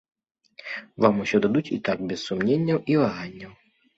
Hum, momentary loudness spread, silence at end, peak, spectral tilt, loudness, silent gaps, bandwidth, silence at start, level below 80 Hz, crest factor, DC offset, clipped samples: none; 16 LU; 0.45 s; -4 dBFS; -7 dB/octave; -24 LUFS; none; 8 kHz; 0.65 s; -60 dBFS; 22 dB; under 0.1%; under 0.1%